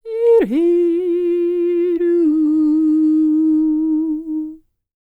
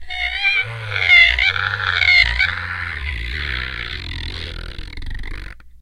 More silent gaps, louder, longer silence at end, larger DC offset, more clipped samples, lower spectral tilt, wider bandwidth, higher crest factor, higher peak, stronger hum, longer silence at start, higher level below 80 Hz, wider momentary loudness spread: neither; about the same, -16 LUFS vs -15 LUFS; first, 0.45 s vs 0 s; neither; neither; first, -8.5 dB/octave vs -3 dB/octave; second, 3.9 kHz vs 15.5 kHz; second, 10 dB vs 20 dB; second, -6 dBFS vs 0 dBFS; neither; about the same, 0.05 s vs 0 s; second, -54 dBFS vs -30 dBFS; second, 7 LU vs 22 LU